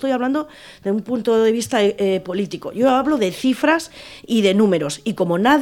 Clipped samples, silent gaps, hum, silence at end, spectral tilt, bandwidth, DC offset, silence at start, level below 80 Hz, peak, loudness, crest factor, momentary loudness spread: under 0.1%; none; none; 0 s; -5 dB/octave; 17 kHz; under 0.1%; 0 s; -56 dBFS; -4 dBFS; -19 LUFS; 16 dB; 9 LU